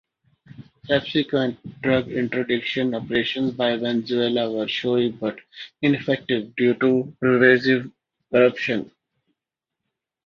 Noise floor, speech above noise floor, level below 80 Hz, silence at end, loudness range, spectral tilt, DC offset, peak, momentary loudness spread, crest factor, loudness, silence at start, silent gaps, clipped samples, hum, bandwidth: -85 dBFS; 64 dB; -60 dBFS; 1.4 s; 3 LU; -7 dB/octave; under 0.1%; -2 dBFS; 9 LU; 20 dB; -22 LUFS; 0.6 s; none; under 0.1%; none; 6.8 kHz